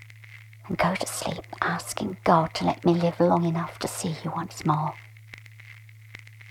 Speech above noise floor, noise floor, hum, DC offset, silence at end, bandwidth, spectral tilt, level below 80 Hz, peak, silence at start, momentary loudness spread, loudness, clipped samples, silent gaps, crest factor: 22 dB; -47 dBFS; none; under 0.1%; 0 s; 15.5 kHz; -5.5 dB/octave; -56 dBFS; -6 dBFS; 0 s; 24 LU; -26 LUFS; under 0.1%; none; 22 dB